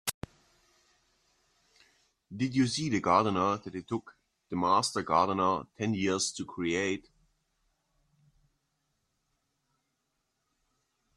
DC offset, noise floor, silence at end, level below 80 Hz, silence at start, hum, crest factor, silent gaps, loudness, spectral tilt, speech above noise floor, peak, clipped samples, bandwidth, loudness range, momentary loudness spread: under 0.1%; -80 dBFS; 4.15 s; -68 dBFS; 0.05 s; none; 22 dB; 0.14-0.21 s; -30 LUFS; -4.5 dB/octave; 51 dB; -10 dBFS; under 0.1%; 13 kHz; 8 LU; 12 LU